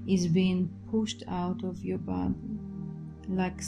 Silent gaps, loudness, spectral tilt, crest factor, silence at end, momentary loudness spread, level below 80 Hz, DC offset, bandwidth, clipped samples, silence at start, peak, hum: none; -31 LUFS; -6.5 dB/octave; 16 dB; 0 s; 13 LU; -52 dBFS; under 0.1%; 10 kHz; under 0.1%; 0 s; -16 dBFS; none